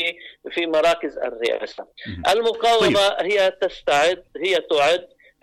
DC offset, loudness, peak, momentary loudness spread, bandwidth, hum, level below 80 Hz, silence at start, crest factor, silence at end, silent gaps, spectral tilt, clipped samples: under 0.1%; -20 LUFS; -10 dBFS; 11 LU; 15.5 kHz; none; -54 dBFS; 0 s; 10 dB; 0.4 s; none; -3 dB/octave; under 0.1%